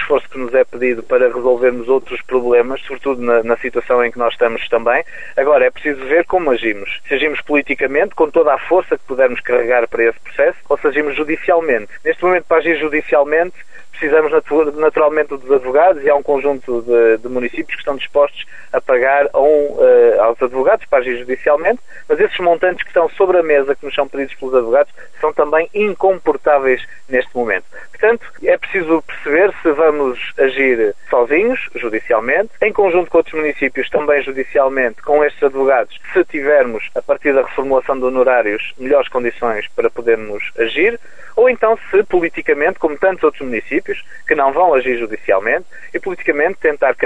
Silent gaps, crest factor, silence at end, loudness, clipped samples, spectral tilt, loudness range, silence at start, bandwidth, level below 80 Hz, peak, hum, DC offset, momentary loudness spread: none; 14 dB; 0 s; -15 LUFS; under 0.1%; -6 dB/octave; 2 LU; 0 s; 8 kHz; -48 dBFS; 0 dBFS; none; 3%; 7 LU